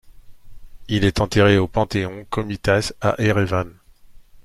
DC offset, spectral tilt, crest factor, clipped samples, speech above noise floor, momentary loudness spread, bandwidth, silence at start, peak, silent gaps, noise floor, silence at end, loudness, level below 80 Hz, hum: under 0.1%; -6 dB/octave; 18 dB; under 0.1%; 26 dB; 11 LU; 13.5 kHz; 0.05 s; -2 dBFS; none; -45 dBFS; 0.05 s; -20 LUFS; -40 dBFS; none